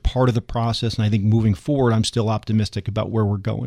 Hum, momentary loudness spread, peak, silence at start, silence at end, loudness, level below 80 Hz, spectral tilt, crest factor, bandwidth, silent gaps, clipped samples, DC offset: none; 5 LU; -6 dBFS; 0.05 s; 0 s; -21 LUFS; -36 dBFS; -7 dB/octave; 14 dB; 10.5 kHz; none; under 0.1%; under 0.1%